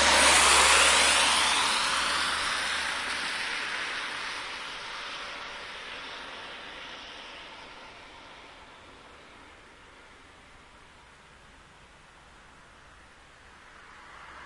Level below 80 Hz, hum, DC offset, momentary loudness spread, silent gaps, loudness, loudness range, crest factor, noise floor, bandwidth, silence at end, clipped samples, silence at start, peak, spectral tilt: -54 dBFS; none; under 0.1%; 27 LU; none; -24 LUFS; 27 LU; 22 dB; -54 dBFS; 11.5 kHz; 0 s; under 0.1%; 0 s; -6 dBFS; 0.5 dB/octave